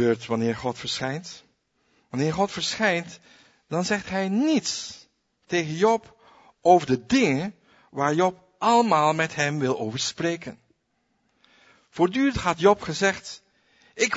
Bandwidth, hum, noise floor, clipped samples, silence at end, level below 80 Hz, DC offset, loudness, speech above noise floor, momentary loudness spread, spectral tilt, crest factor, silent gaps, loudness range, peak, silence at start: 8 kHz; none; -72 dBFS; under 0.1%; 0 s; -56 dBFS; under 0.1%; -24 LUFS; 49 dB; 15 LU; -4.5 dB/octave; 22 dB; none; 5 LU; -4 dBFS; 0 s